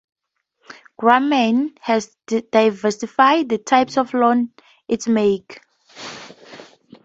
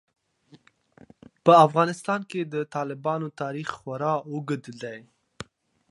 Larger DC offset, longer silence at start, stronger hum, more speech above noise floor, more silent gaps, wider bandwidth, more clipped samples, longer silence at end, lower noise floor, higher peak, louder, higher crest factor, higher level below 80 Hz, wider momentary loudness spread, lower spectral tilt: neither; second, 0.7 s vs 1.45 s; neither; first, 49 dB vs 33 dB; neither; second, 8 kHz vs 11.5 kHz; neither; about the same, 0.45 s vs 0.45 s; first, -66 dBFS vs -58 dBFS; about the same, 0 dBFS vs -2 dBFS; first, -18 LUFS vs -24 LUFS; about the same, 20 dB vs 24 dB; about the same, -64 dBFS vs -68 dBFS; second, 18 LU vs 26 LU; second, -4.5 dB/octave vs -6.5 dB/octave